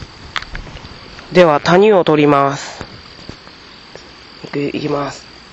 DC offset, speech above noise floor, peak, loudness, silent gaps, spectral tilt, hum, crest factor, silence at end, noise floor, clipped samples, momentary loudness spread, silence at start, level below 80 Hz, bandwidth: under 0.1%; 26 dB; 0 dBFS; -14 LUFS; none; -6 dB/octave; none; 16 dB; 0.3 s; -38 dBFS; under 0.1%; 25 LU; 0 s; -42 dBFS; 8.4 kHz